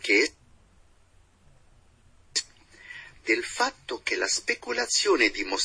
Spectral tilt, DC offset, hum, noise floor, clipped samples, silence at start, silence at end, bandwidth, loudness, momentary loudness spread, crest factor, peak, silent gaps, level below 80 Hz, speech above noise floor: -0.5 dB/octave; under 0.1%; none; -59 dBFS; under 0.1%; 0 s; 0 s; 10.5 kHz; -26 LUFS; 18 LU; 22 dB; -8 dBFS; none; -60 dBFS; 34 dB